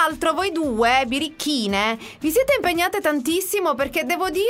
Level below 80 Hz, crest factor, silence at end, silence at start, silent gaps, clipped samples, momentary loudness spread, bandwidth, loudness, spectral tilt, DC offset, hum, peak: -48 dBFS; 16 dB; 0 s; 0 s; none; under 0.1%; 5 LU; 16 kHz; -21 LUFS; -3 dB/octave; under 0.1%; none; -6 dBFS